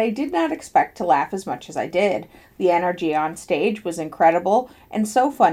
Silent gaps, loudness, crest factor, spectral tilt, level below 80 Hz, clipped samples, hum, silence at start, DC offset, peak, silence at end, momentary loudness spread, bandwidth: none; -21 LUFS; 18 dB; -5 dB/octave; -58 dBFS; under 0.1%; none; 0 s; under 0.1%; -4 dBFS; 0 s; 10 LU; 16 kHz